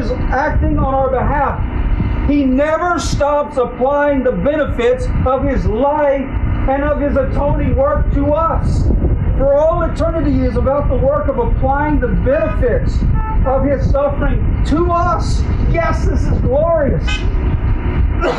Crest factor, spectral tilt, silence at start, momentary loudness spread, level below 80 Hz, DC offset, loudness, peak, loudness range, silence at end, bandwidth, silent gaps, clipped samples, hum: 8 dB; -7.5 dB/octave; 0 s; 4 LU; -18 dBFS; under 0.1%; -15 LUFS; -6 dBFS; 1 LU; 0 s; 9.8 kHz; none; under 0.1%; none